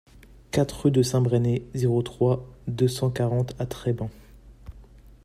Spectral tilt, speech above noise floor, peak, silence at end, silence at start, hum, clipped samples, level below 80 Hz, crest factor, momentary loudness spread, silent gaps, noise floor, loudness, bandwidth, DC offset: -7 dB/octave; 25 dB; -8 dBFS; 0.4 s; 0.55 s; none; under 0.1%; -48 dBFS; 16 dB; 8 LU; none; -49 dBFS; -25 LUFS; 14.5 kHz; under 0.1%